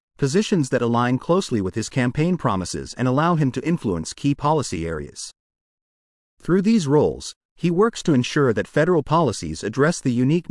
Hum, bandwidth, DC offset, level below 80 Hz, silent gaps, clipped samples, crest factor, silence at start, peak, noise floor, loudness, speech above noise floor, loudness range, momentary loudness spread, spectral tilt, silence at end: none; 12 kHz; under 0.1%; -50 dBFS; 5.40-5.50 s, 5.61-6.37 s, 7.36-7.56 s; under 0.1%; 16 dB; 0.2 s; -6 dBFS; under -90 dBFS; -21 LUFS; over 70 dB; 4 LU; 9 LU; -6 dB/octave; 0.1 s